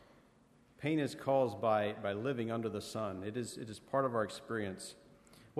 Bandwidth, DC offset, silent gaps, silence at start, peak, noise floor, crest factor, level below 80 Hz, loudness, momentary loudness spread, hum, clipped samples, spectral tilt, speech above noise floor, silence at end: 13 kHz; under 0.1%; none; 0.8 s; -20 dBFS; -66 dBFS; 18 dB; -74 dBFS; -37 LUFS; 10 LU; none; under 0.1%; -6 dB/octave; 30 dB; 0 s